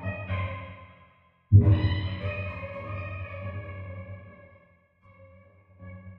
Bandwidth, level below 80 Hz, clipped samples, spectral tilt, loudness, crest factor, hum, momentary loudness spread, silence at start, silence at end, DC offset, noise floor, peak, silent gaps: 4.3 kHz; -44 dBFS; under 0.1%; -10.5 dB/octave; -27 LUFS; 22 dB; none; 25 LU; 0 s; 0 s; under 0.1%; -61 dBFS; -6 dBFS; none